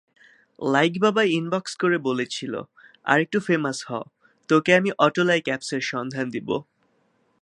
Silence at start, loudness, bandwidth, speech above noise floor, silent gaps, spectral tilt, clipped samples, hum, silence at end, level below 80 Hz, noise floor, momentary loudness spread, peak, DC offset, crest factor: 0.6 s; -23 LUFS; 11.5 kHz; 44 dB; none; -5 dB/octave; under 0.1%; none; 0.8 s; -72 dBFS; -66 dBFS; 12 LU; -2 dBFS; under 0.1%; 22 dB